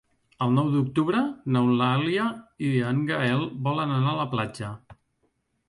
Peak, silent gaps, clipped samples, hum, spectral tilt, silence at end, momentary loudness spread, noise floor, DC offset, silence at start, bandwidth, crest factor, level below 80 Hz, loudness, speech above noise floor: -10 dBFS; none; under 0.1%; none; -7.5 dB/octave; 0.75 s; 8 LU; -72 dBFS; under 0.1%; 0.4 s; 11.5 kHz; 14 dB; -62 dBFS; -25 LUFS; 48 dB